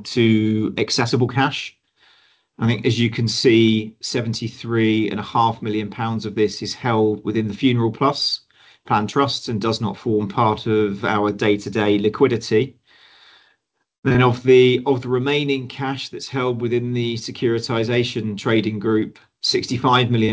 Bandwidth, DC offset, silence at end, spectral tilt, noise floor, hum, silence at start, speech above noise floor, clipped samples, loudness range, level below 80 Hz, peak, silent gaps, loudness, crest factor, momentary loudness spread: 8 kHz; under 0.1%; 0 s; -6 dB/octave; -67 dBFS; none; 0 s; 48 dB; under 0.1%; 3 LU; -52 dBFS; -2 dBFS; 13.99-14.03 s; -20 LUFS; 18 dB; 8 LU